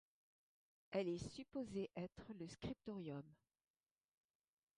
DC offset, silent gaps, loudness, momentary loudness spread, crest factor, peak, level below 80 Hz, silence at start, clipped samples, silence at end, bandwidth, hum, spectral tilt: under 0.1%; none; -49 LUFS; 10 LU; 22 dB; -30 dBFS; -72 dBFS; 0.9 s; under 0.1%; 1.45 s; 11 kHz; none; -6.5 dB/octave